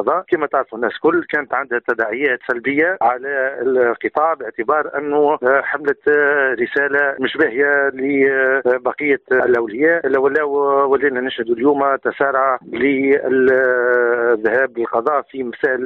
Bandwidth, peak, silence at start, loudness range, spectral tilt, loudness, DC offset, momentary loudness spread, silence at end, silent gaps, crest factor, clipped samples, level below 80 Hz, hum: 4.3 kHz; -4 dBFS; 0 s; 2 LU; -7.5 dB/octave; -17 LUFS; under 0.1%; 5 LU; 0 s; none; 12 dB; under 0.1%; -60 dBFS; none